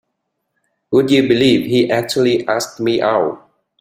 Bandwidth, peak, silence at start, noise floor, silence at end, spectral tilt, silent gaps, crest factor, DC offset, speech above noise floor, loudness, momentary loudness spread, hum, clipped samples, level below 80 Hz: 16 kHz; -2 dBFS; 0.9 s; -73 dBFS; 0.45 s; -5 dB/octave; none; 14 dB; under 0.1%; 59 dB; -15 LUFS; 6 LU; none; under 0.1%; -54 dBFS